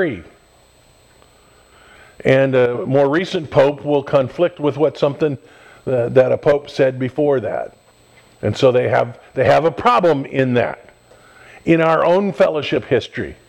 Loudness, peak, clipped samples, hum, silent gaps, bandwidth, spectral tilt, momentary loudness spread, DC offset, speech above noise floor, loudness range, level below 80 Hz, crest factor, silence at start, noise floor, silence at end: -17 LUFS; 0 dBFS; under 0.1%; none; none; 9.4 kHz; -7 dB/octave; 10 LU; under 0.1%; 35 dB; 2 LU; -52 dBFS; 18 dB; 0 s; -51 dBFS; 0.15 s